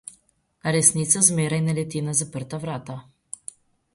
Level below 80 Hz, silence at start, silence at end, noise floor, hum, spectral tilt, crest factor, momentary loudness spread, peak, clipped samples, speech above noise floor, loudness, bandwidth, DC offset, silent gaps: -60 dBFS; 0.65 s; 0.95 s; -64 dBFS; none; -4 dB/octave; 24 dB; 22 LU; -2 dBFS; under 0.1%; 41 dB; -21 LUFS; 11.5 kHz; under 0.1%; none